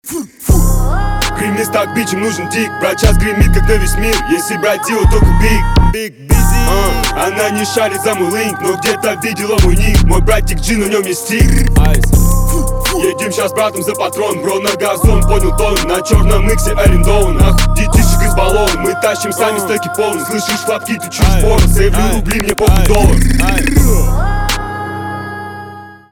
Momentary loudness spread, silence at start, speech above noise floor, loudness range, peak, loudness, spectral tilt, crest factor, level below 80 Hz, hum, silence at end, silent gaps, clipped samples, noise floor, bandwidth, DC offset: 6 LU; 0.05 s; 21 dB; 2 LU; 0 dBFS; -13 LUFS; -5 dB/octave; 10 dB; -14 dBFS; none; 0.15 s; none; under 0.1%; -31 dBFS; 18 kHz; under 0.1%